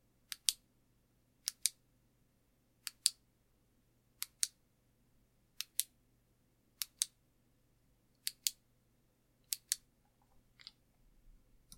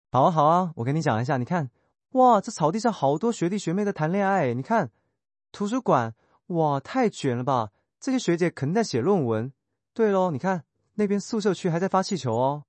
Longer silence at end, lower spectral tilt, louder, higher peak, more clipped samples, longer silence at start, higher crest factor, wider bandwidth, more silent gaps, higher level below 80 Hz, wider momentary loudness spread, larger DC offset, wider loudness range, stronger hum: first, 2 s vs 0.05 s; second, 3 dB/octave vs -6.5 dB/octave; second, -39 LUFS vs -24 LUFS; about the same, -6 dBFS vs -8 dBFS; neither; first, 0.3 s vs 0.15 s; first, 40 dB vs 18 dB; first, 16.5 kHz vs 8.8 kHz; neither; second, -76 dBFS vs -70 dBFS; first, 14 LU vs 9 LU; neither; about the same, 3 LU vs 3 LU; neither